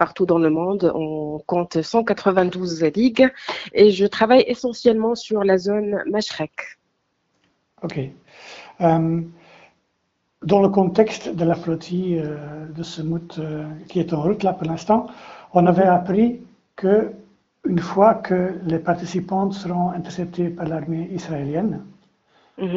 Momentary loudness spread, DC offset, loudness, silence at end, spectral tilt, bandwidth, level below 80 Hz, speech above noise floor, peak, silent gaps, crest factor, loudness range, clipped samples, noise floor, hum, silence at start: 14 LU; under 0.1%; -20 LUFS; 0 s; -6 dB/octave; 7.8 kHz; -56 dBFS; 51 dB; 0 dBFS; none; 20 dB; 8 LU; under 0.1%; -71 dBFS; none; 0 s